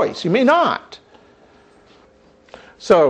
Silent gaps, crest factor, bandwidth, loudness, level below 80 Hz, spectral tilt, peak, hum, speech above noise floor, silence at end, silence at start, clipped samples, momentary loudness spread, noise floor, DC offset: none; 16 dB; 9.4 kHz; -16 LUFS; -60 dBFS; -5.5 dB/octave; -4 dBFS; none; 36 dB; 0 s; 0 s; under 0.1%; 22 LU; -51 dBFS; under 0.1%